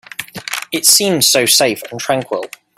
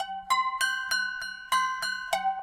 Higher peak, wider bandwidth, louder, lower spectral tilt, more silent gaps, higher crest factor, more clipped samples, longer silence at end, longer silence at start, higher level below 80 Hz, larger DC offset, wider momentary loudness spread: first, 0 dBFS vs -12 dBFS; first, over 20 kHz vs 16.5 kHz; first, -12 LUFS vs -28 LUFS; first, -1.5 dB/octave vs 1 dB/octave; neither; about the same, 16 dB vs 18 dB; neither; first, 0.3 s vs 0 s; first, 0.2 s vs 0 s; about the same, -60 dBFS vs -64 dBFS; neither; first, 14 LU vs 5 LU